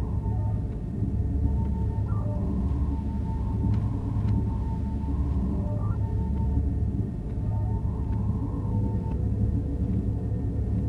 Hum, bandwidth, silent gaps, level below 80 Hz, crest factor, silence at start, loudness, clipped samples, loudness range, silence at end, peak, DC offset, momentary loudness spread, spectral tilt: none; 3.3 kHz; none; -30 dBFS; 14 dB; 0 s; -28 LUFS; under 0.1%; 1 LU; 0 s; -12 dBFS; under 0.1%; 3 LU; -11 dB/octave